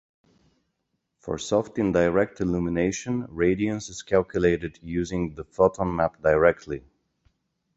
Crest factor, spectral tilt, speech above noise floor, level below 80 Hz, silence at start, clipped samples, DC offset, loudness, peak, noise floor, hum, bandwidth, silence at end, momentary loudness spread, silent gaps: 22 dB; -6 dB/octave; 53 dB; -46 dBFS; 1.25 s; under 0.1%; under 0.1%; -25 LUFS; -4 dBFS; -77 dBFS; none; 8.2 kHz; 0.95 s; 11 LU; none